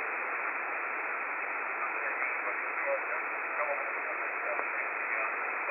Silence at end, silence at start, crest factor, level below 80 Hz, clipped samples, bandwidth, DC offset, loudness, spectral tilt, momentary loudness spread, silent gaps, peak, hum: 0 s; 0 s; 20 dB; -88 dBFS; under 0.1%; 12.5 kHz; under 0.1%; -32 LUFS; -5.5 dB/octave; 2 LU; none; -14 dBFS; none